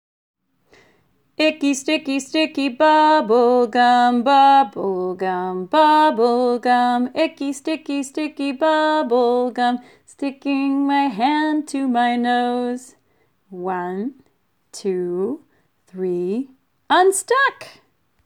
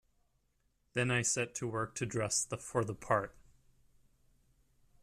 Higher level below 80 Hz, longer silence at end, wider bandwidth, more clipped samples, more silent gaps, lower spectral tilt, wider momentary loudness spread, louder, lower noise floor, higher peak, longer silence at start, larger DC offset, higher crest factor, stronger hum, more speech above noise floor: second, -74 dBFS vs -66 dBFS; second, 0.55 s vs 1.7 s; about the same, 15.5 kHz vs 14.5 kHz; neither; neither; about the same, -4 dB/octave vs -3.5 dB/octave; first, 12 LU vs 6 LU; first, -18 LUFS vs -35 LUFS; second, -65 dBFS vs -76 dBFS; first, -4 dBFS vs -16 dBFS; first, 1.4 s vs 0.95 s; neither; second, 14 dB vs 22 dB; neither; first, 47 dB vs 41 dB